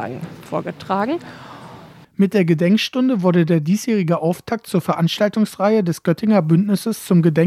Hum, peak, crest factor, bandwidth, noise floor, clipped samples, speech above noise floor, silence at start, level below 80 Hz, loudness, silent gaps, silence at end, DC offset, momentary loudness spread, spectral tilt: none; -2 dBFS; 14 dB; 15 kHz; -41 dBFS; under 0.1%; 24 dB; 0 s; -62 dBFS; -18 LUFS; none; 0 s; under 0.1%; 12 LU; -7 dB/octave